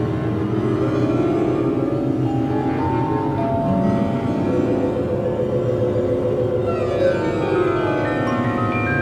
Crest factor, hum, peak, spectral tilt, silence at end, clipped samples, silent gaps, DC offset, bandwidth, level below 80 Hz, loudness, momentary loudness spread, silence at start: 12 dB; none; -6 dBFS; -8.5 dB/octave; 0 s; under 0.1%; none; under 0.1%; 10 kHz; -42 dBFS; -20 LUFS; 2 LU; 0 s